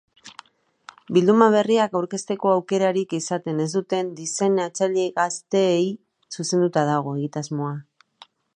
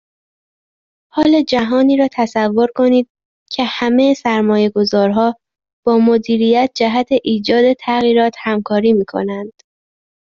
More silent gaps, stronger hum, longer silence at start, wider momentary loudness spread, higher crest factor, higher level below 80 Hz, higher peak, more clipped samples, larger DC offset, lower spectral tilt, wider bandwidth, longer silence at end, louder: second, none vs 3.10-3.15 s, 3.25-3.46 s, 5.73-5.83 s; neither; second, 0.25 s vs 1.15 s; first, 11 LU vs 8 LU; first, 20 dB vs 12 dB; second, -74 dBFS vs -56 dBFS; about the same, -2 dBFS vs -2 dBFS; neither; neither; about the same, -5 dB/octave vs -6 dB/octave; first, 10.5 kHz vs 7.4 kHz; about the same, 0.75 s vs 0.85 s; second, -22 LUFS vs -14 LUFS